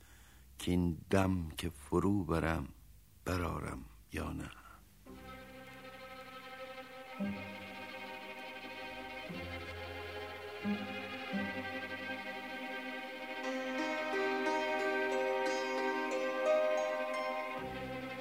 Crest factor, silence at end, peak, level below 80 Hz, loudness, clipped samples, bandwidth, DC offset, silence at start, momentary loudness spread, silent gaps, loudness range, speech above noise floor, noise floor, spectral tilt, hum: 22 dB; 0 s; -16 dBFS; -56 dBFS; -38 LUFS; under 0.1%; 16 kHz; under 0.1%; 0 s; 16 LU; none; 12 LU; 24 dB; -60 dBFS; -5.5 dB/octave; none